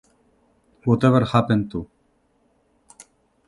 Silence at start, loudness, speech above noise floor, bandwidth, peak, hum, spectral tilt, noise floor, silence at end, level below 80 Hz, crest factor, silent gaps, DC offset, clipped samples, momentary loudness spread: 0.85 s; -20 LUFS; 46 dB; 11.5 kHz; -2 dBFS; none; -8 dB/octave; -64 dBFS; 1.65 s; -50 dBFS; 22 dB; none; under 0.1%; under 0.1%; 16 LU